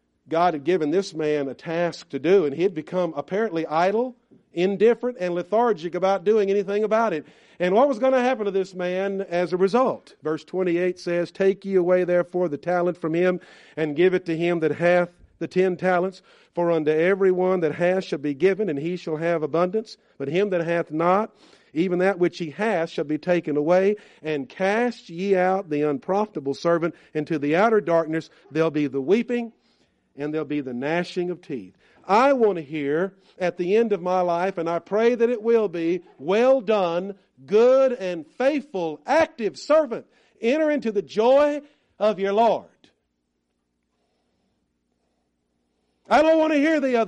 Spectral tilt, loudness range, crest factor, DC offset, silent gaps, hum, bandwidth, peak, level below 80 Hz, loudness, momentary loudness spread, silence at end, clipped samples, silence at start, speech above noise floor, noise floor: -6.5 dB/octave; 3 LU; 16 dB; under 0.1%; none; none; 9.6 kHz; -6 dBFS; -68 dBFS; -23 LUFS; 10 LU; 0 s; under 0.1%; 0.3 s; 53 dB; -75 dBFS